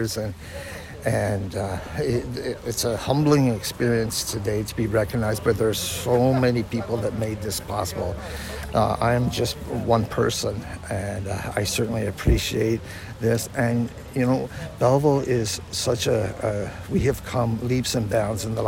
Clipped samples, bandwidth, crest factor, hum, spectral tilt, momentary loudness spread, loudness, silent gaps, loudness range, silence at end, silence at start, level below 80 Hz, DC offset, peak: under 0.1%; 16.5 kHz; 16 dB; none; -5.5 dB/octave; 9 LU; -24 LUFS; none; 2 LU; 0 s; 0 s; -38 dBFS; under 0.1%; -8 dBFS